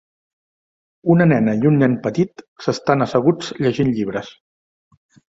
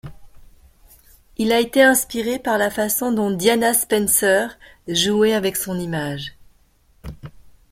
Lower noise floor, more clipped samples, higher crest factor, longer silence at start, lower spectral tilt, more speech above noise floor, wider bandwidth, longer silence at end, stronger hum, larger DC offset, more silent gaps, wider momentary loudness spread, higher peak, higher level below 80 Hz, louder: first, under -90 dBFS vs -56 dBFS; neither; about the same, 18 dB vs 18 dB; first, 1.05 s vs 0.05 s; first, -7.5 dB/octave vs -3 dB/octave; first, over 73 dB vs 38 dB; second, 7.8 kHz vs 16.5 kHz; first, 1 s vs 0.4 s; neither; neither; first, 2.48-2.56 s vs none; second, 11 LU vs 18 LU; about the same, -2 dBFS vs -2 dBFS; second, -56 dBFS vs -48 dBFS; about the same, -18 LUFS vs -18 LUFS